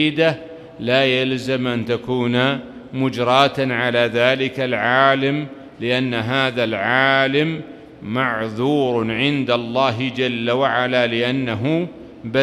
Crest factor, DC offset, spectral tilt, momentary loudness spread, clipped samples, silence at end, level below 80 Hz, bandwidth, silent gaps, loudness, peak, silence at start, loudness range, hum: 18 dB; under 0.1%; -6 dB/octave; 11 LU; under 0.1%; 0 s; -56 dBFS; 12.5 kHz; none; -19 LUFS; 0 dBFS; 0 s; 2 LU; none